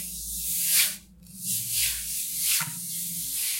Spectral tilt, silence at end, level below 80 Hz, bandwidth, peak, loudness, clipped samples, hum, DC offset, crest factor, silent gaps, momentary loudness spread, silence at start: 1 dB/octave; 0 s; -54 dBFS; 16.5 kHz; -8 dBFS; -25 LUFS; under 0.1%; none; under 0.1%; 22 dB; none; 9 LU; 0 s